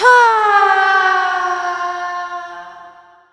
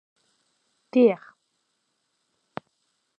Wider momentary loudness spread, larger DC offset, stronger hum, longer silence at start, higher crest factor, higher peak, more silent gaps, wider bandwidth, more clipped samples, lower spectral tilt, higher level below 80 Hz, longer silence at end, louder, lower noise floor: second, 17 LU vs 22 LU; neither; neither; second, 0 s vs 0.95 s; second, 14 dB vs 22 dB; first, 0 dBFS vs -8 dBFS; neither; first, 11 kHz vs 5.6 kHz; neither; second, -0.5 dB/octave vs -8 dB/octave; first, -64 dBFS vs -80 dBFS; second, 0.45 s vs 2.05 s; first, -14 LUFS vs -22 LUFS; second, -42 dBFS vs -75 dBFS